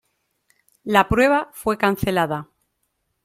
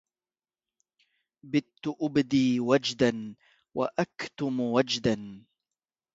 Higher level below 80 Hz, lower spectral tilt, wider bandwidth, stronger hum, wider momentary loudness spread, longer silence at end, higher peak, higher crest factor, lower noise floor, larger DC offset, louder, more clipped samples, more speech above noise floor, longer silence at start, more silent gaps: first, -44 dBFS vs -64 dBFS; about the same, -5.5 dB/octave vs -5.5 dB/octave; first, 16.5 kHz vs 7.8 kHz; neither; about the same, 10 LU vs 12 LU; about the same, 0.8 s vs 0.75 s; first, 0 dBFS vs -10 dBFS; about the same, 22 dB vs 20 dB; second, -73 dBFS vs under -90 dBFS; neither; first, -20 LUFS vs -28 LUFS; neither; second, 54 dB vs over 62 dB; second, 0.85 s vs 1.45 s; neither